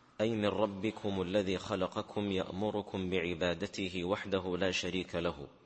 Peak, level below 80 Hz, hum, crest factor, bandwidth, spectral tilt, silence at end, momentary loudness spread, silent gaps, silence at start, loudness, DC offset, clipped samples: -16 dBFS; -62 dBFS; none; 20 dB; 8.4 kHz; -5.5 dB/octave; 0.15 s; 4 LU; none; 0.2 s; -35 LUFS; under 0.1%; under 0.1%